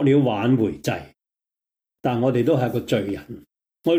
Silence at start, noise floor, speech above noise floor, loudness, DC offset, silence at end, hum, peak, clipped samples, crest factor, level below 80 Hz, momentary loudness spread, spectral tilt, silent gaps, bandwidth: 0 s; -87 dBFS; 66 dB; -22 LUFS; under 0.1%; 0 s; none; -8 dBFS; under 0.1%; 14 dB; -58 dBFS; 13 LU; -7.5 dB/octave; none; 16.5 kHz